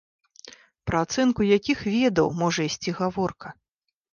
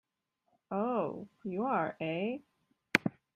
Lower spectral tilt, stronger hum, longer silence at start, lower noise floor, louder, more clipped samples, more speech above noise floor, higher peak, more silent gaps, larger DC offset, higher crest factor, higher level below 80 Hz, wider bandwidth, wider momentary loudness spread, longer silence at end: about the same, -5 dB/octave vs -5.5 dB/octave; neither; second, 0.45 s vs 0.7 s; second, -49 dBFS vs -81 dBFS; first, -24 LUFS vs -34 LUFS; neither; second, 26 dB vs 46 dB; second, -8 dBFS vs -4 dBFS; neither; neither; second, 18 dB vs 32 dB; first, -52 dBFS vs -78 dBFS; second, 7.2 kHz vs 15 kHz; about the same, 9 LU vs 9 LU; first, 0.6 s vs 0.25 s